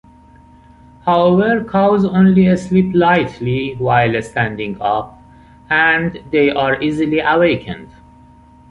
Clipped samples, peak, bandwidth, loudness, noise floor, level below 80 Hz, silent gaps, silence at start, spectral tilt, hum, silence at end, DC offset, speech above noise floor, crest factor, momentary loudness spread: under 0.1%; -2 dBFS; 8.8 kHz; -15 LUFS; -44 dBFS; -44 dBFS; none; 1.05 s; -7.5 dB/octave; none; 0.85 s; under 0.1%; 30 dB; 14 dB; 8 LU